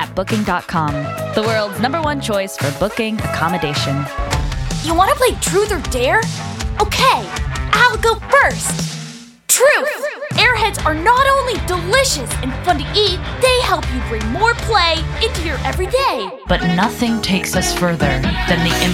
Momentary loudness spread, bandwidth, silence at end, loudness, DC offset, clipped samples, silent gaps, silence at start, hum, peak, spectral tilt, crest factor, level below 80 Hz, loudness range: 8 LU; 17.5 kHz; 0 s; -16 LUFS; under 0.1%; under 0.1%; none; 0 s; none; 0 dBFS; -3.5 dB/octave; 16 dB; -28 dBFS; 4 LU